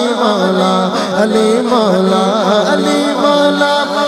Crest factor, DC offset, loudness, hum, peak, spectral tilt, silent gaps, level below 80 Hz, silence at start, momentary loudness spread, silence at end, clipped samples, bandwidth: 12 dB; under 0.1%; -12 LUFS; none; 0 dBFS; -5 dB/octave; none; -56 dBFS; 0 s; 2 LU; 0 s; under 0.1%; 15 kHz